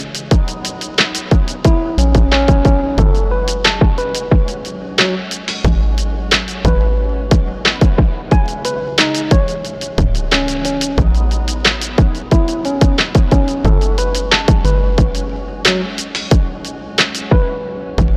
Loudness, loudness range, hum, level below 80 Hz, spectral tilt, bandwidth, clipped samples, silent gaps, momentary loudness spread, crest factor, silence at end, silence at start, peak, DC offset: -15 LUFS; 2 LU; none; -16 dBFS; -5.5 dB/octave; 11 kHz; under 0.1%; none; 8 LU; 12 dB; 0 s; 0 s; -2 dBFS; under 0.1%